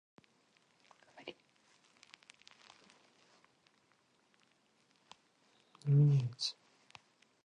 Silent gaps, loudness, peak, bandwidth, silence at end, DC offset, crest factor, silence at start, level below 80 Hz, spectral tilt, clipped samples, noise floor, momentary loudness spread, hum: none; -33 LUFS; -20 dBFS; 9.6 kHz; 0.95 s; under 0.1%; 20 dB; 1.25 s; -80 dBFS; -6.5 dB/octave; under 0.1%; -74 dBFS; 30 LU; none